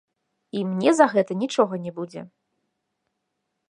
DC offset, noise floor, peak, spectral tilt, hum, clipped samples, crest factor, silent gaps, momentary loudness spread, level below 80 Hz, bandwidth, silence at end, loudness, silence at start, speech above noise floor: under 0.1%; -79 dBFS; -2 dBFS; -5.5 dB/octave; none; under 0.1%; 24 dB; none; 16 LU; -76 dBFS; 11.5 kHz; 1.4 s; -22 LUFS; 0.55 s; 57 dB